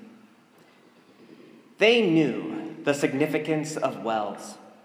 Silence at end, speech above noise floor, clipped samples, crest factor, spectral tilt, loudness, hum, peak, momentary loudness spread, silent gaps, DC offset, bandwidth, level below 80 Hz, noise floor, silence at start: 0.15 s; 32 dB; under 0.1%; 22 dB; -5 dB/octave; -25 LUFS; none; -6 dBFS; 14 LU; none; under 0.1%; 16 kHz; -82 dBFS; -56 dBFS; 0.05 s